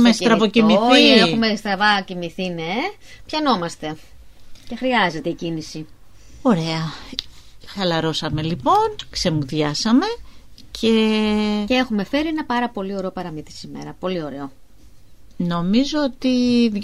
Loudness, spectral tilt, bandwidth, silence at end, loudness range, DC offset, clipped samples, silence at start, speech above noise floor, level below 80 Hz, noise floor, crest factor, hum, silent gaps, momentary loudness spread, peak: -19 LUFS; -5 dB/octave; 12.5 kHz; 0 s; 8 LU; 0.7%; under 0.1%; 0 s; 28 dB; -46 dBFS; -48 dBFS; 20 dB; none; none; 17 LU; 0 dBFS